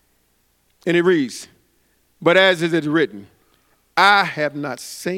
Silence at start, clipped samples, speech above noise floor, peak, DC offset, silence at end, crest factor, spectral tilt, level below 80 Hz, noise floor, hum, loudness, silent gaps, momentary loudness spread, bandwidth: 0.85 s; under 0.1%; 45 dB; 0 dBFS; under 0.1%; 0 s; 20 dB; -4.5 dB/octave; -68 dBFS; -63 dBFS; none; -18 LUFS; none; 14 LU; 16 kHz